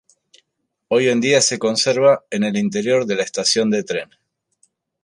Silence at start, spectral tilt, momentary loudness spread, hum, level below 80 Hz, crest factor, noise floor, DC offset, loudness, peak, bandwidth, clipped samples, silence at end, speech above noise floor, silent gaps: 0.9 s; -3.5 dB/octave; 7 LU; none; -66 dBFS; 16 dB; -74 dBFS; under 0.1%; -17 LUFS; -2 dBFS; 11.5 kHz; under 0.1%; 1 s; 57 dB; none